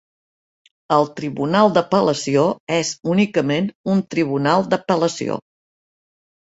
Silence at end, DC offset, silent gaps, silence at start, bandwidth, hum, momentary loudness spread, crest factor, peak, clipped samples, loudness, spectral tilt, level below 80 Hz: 1.1 s; under 0.1%; 2.60-2.67 s, 3.75-3.84 s; 0.9 s; 8 kHz; none; 7 LU; 18 dB; -2 dBFS; under 0.1%; -19 LUFS; -5.5 dB/octave; -60 dBFS